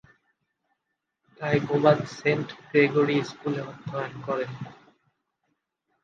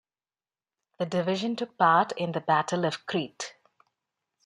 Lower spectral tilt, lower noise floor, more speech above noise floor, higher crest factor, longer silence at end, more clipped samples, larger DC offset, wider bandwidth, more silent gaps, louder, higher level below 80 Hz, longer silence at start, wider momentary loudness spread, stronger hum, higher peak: first, -7 dB/octave vs -5 dB/octave; second, -81 dBFS vs under -90 dBFS; second, 56 dB vs over 63 dB; about the same, 24 dB vs 20 dB; first, 1.3 s vs 0.95 s; neither; neither; second, 7.4 kHz vs 11 kHz; neither; about the same, -26 LUFS vs -27 LUFS; first, -68 dBFS vs -76 dBFS; first, 1.4 s vs 1 s; about the same, 13 LU vs 14 LU; neither; first, -4 dBFS vs -8 dBFS